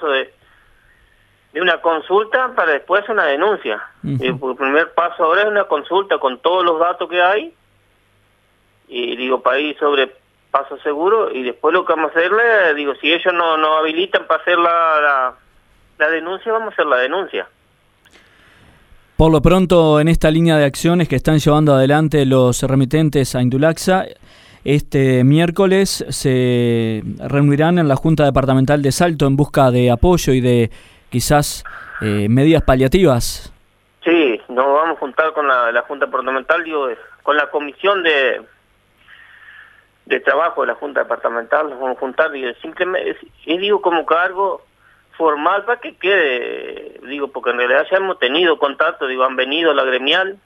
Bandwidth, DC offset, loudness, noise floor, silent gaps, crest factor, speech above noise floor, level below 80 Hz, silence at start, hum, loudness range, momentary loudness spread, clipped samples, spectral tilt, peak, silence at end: 16 kHz; under 0.1%; -16 LUFS; -57 dBFS; none; 16 dB; 42 dB; -34 dBFS; 0 s; none; 5 LU; 9 LU; under 0.1%; -5.5 dB/octave; 0 dBFS; 0.1 s